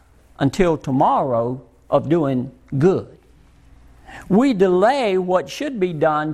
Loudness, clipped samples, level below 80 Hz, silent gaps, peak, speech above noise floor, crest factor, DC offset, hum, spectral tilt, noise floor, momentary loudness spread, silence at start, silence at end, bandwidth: -19 LUFS; under 0.1%; -46 dBFS; none; -2 dBFS; 32 dB; 16 dB; under 0.1%; none; -7 dB/octave; -50 dBFS; 10 LU; 0.4 s; 0 s; 13 kHz